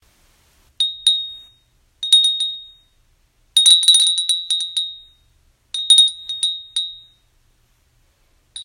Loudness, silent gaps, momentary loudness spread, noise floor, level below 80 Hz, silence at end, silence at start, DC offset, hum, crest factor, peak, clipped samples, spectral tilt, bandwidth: -14 LUFS; none; 18 LU; -59 dBFS; -62 dBFS; 0 s; 0.8 s; under 0.1%; none; 20 dB; 0 dBFS; under 0.1%; 5 dB/octave; 16 kHz